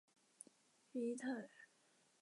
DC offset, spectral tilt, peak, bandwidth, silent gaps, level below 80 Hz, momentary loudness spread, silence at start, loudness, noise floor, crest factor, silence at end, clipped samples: under 0.1%; -4.5 dB/octave; -34 dBFS; 11.5 kHz; none; under -90 dBFS; 20 LU; 0.95 s; -46 LUFS; -76 dBFS; 16 dB; 0.55 s; under 0.1%